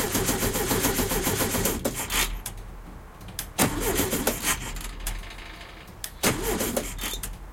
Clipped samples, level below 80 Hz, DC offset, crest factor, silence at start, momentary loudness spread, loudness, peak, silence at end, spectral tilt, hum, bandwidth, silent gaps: under 0.1%; -38 dBFS; under 0.1%; 22 dB; 0 s; 17 LU; -26 LUFS; -6 dBFS; 0 s; -3 dB/octave; none; 17 kHz; none